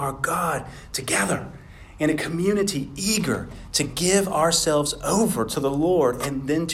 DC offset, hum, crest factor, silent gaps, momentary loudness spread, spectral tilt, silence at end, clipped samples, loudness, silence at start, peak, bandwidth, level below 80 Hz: under 0.1%; none; 18 dB; none; 8 LU; -4 dB/octave; 0 s; under 0.1%; -23 LUFS; 0 s; -4 dBFS; 16.5 kHz; -46 dBFS